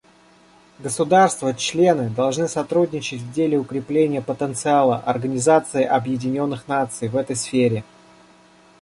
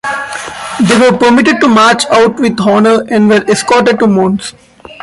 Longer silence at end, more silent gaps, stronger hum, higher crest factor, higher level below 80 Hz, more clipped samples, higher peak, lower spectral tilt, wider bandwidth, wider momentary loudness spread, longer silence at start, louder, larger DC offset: first, 1 s vs 0.1 s; neither; neither; first, 18 dB vs 8 dB; second, -60 dBFS vs -46 dBFS; neither; about the same, -2 dBFS vs 0 dBFS; about the same, -5 dB/octave vs -4.5 dB/octave; about the same, 11.5 kHz vs 11.5 kHz; second, 7 LU vs 11 LU; first, 0.8 s vs 0.05 s; second, -20 LUFS vs -8 LUFS; neither